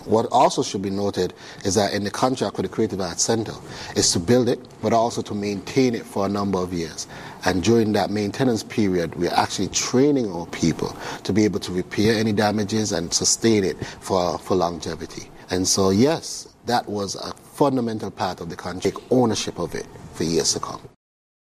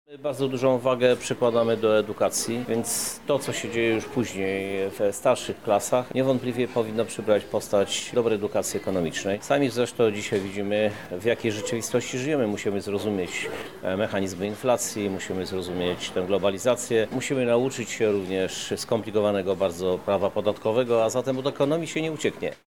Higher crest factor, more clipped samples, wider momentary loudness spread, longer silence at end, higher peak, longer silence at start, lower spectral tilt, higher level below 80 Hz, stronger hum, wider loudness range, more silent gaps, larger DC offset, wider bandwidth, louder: about the same, 18 dB vs 18 dB; neither; first, 12 LU vs 6 LU; first, 0.65 s vs 0.15 s; about the same, -6 dBFS vs -8 dBFS; about the same, 0 s vs 0.1 s; about the same, -4 dB/octave vs -4.5 dB/octave; first, -52 dBFS vs -60 dBFS; neither; about the same, 3 LU vs 3 LU; neither; second, under 0.1% vs 0.2%; second, 15.5 kHz vs 20 kHz; first, -22 LUFS vs -25 LUFS